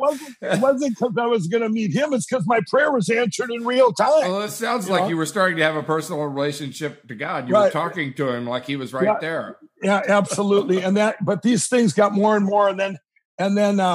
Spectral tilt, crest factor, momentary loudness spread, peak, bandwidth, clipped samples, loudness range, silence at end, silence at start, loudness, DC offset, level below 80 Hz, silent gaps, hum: -5 dB/octave; 18 dB; 9 LU; -4 dBFS; 15.5 kHz; under 0.1%; 4 LU; 0 s; 0 s; -20 LUFS; under 0.1%; -74 dBFS; 13.25-13.38 s; none